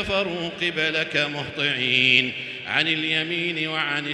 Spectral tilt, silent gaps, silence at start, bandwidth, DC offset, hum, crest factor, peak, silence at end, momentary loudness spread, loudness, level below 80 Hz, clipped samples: -4 dB/octave; none; 0 s; 12 kHz; under 0.1%; none; 22 dB; -2 dBFS; 0 s; 9 LU; -22 LUFS; -56 dBFS; under 0.1%